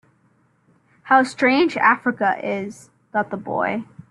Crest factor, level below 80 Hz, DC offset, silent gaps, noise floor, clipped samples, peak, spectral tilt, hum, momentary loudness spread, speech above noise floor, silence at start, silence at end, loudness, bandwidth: 20 dB; -66 dBFS; under 0.1%; none; -61 dBFS; under 0.1%; -2 dBFS; -5 dB/octave; none; 11 LU; 41 dB; 1.05 s; 0.25 s; -20 LUFS; 11.5 kHz